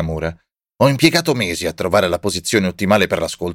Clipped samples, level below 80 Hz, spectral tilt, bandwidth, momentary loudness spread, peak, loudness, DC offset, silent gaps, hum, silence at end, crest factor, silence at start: under 0.1%; -42 dBFS; -4.5 dB/octave; 17 kHz; 8 LU; -2 dBFS; -17 LUFS; under 0.1%; none; none; 0 s; 16 dB; 0 s